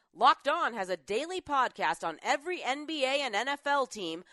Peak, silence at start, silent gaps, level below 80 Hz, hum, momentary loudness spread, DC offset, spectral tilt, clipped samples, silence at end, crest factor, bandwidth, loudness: -10 dBFS; 0.15 s; none; -72 dBFS; none; 8 LU; under 0.1%; -2 dB/octave; under 0.1%; 0.1 s; 20 dB; 11.5 kHz; -30 LUFS